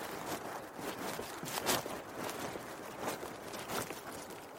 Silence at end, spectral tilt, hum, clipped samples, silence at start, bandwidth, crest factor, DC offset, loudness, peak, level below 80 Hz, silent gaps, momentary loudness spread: 0 s; -2.5 dB/octave; none; under 0.1%; 0 s; 16.5 kHz; 26 dB; under 0.1%; -40 LUFS; -16 dBFS; -68 dBFS; none; 10 LU